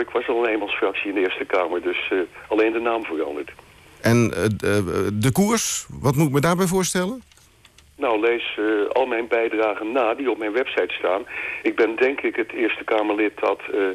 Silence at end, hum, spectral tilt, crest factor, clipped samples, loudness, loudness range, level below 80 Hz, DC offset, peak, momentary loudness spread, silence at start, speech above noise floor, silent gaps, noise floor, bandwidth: 0 s; none; -5 dB/octave; 12 dB; under 0.1%; -22 LUFS; 2 LU; -54 dBFS; under 0.1%; -8 dBFS; 6 LU; 0 s; 31 dB; none; -52 dBFS; 14.5 kHz